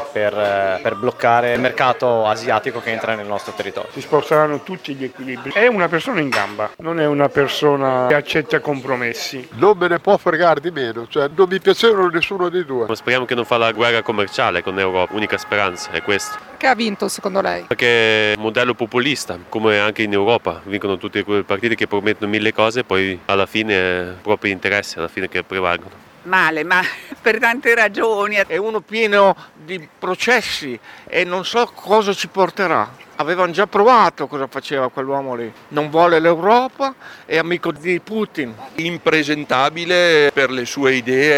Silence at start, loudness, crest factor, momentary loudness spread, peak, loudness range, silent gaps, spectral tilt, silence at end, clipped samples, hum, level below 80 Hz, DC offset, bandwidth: 0 s; -17 LUFS; 18 dB; 10 LU; 0 dBFS; 3 LU; none; -4.5 dB/octave; 0 s; under 0.1%; none; -58 dBFS; under 0.1%; 16 kHz